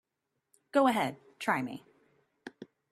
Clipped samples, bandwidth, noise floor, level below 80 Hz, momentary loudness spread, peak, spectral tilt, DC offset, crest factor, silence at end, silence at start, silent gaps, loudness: under 0.1%; 13.5 kHz; -84 dBFS; -78 dBFS; 23 LU; -14 dBFS; -5 dB/octave; under 0.1%; 20 dB; 0.25 s; 0.75 s; none; -31 LUFS